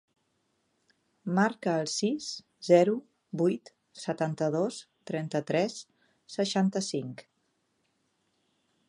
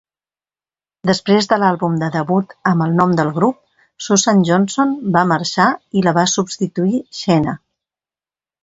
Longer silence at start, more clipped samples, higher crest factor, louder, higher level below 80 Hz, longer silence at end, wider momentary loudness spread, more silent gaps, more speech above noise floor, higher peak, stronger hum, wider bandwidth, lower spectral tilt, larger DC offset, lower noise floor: first, 1.25 s vs 1.05 s; neither; first, 22 dB vs 16 dB; second, -29 LUFS vs -16 LUFS; second, -80 dBFS vs -56 dBFS; first, 1.65 s vs 1.05 s; first, 16 LU vs 6 LU; neither; second, 47 dB vs over 75 dB; second, -8 dBFS vs 0 dBFS; neither; first, 11.5 kHz vs 8 kHz; about the same, -5.5 dB/octave vs -5 dB/octave; neither; second, -75 dBFS vs under -90 dBFS